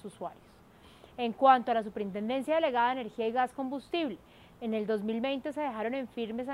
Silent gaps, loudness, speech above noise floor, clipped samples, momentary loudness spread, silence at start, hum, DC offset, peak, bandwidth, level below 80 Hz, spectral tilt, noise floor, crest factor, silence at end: none; -31 LUFS; 26 dB; under 0.1%; 14 LU; 0.05 s; none; under 0.1%; -10 dBFS; 13 kHz; -68 dBFS; -6 dB/octave; -57 dBFS; 22 dB; 0 s